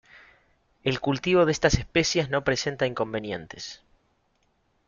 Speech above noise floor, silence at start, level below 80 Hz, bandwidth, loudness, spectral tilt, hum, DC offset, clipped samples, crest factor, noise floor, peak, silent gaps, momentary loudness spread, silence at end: 44 dB; 0.85 s; -44 dBFS; 7.4 kHz; -25 LUFS; -4.5 dB/octave; none; under 0.1%; under 0.1%; 20 dB; -69 dBFS; -6 dBFS; none; 13 LU; 1.1 s